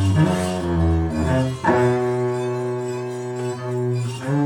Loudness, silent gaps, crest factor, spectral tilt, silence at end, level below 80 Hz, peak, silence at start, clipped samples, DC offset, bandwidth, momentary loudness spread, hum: -22 LUFS; none; 16 dB; -7 dB/octave; 0 s; -36 dBFS; -4 dBFS; 0 s; under 0.1%; under 0.1%; 13.5 kHz; 9 LU; none